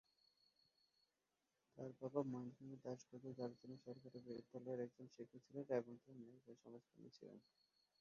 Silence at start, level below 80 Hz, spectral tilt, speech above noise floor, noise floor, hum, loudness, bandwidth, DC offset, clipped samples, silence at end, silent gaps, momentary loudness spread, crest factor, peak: 1.75 s; under -90 dBFS; -7.5 dB/octave; over 38 dB; under -90 dBFS; none; -52 LUFS; 7 kHz; under 0.1%; under 0.1%; 0.6 s; none; 17 LU; 24 dB; -30 dBFS